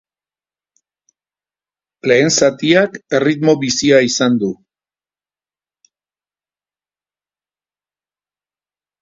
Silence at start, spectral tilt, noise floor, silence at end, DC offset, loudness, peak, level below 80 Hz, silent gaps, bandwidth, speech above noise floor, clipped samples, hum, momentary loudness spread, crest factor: 2.05 s; -4 dB/octave; under -90 dBFS; 4.5 s; under 0.1%; -14 LUFS; 0 dBFS; -58 dBFS; none; 7.8 kHz; over 77 dB; under 0.1%; 50 Hz at -50 dBFS; 8 LU; 18 dB